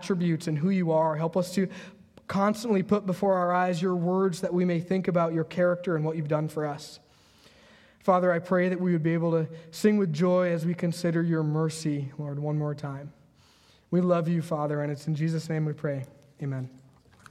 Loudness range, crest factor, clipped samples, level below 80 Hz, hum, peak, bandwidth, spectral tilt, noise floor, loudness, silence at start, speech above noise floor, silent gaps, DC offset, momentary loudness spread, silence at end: 4 LU; 18 dB; under 0.1%; -68 dBFS; none; -8 dBFS; 13.5 kHz; -7.5 dB/octave; -60 dBFS; -27 LUFS; 0 s; 33 dB; none; under 0.1%; 10 LU; 0.55 s